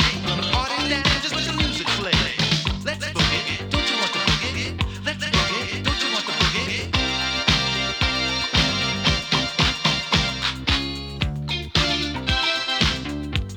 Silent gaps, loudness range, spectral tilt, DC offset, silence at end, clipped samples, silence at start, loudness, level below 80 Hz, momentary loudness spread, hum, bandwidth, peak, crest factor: none; 2 LU; -3.5 dB/octave; under 0.1%; 0 s; under 0.1%; 0 s; -21 LUFS; -34 dBFS; 6 LU; none; 20 kHz; -2 dBFS; 20 dB